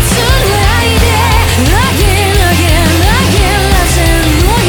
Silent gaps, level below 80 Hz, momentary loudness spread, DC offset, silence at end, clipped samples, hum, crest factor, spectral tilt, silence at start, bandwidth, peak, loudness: none; -14 dBFS; 1 LU; under 0.1%; 0 s; under 0.1%; none; 8 dB; -4 dB/octave; 0 s; over 20 kHz; 0 dBFS; -9 LUFS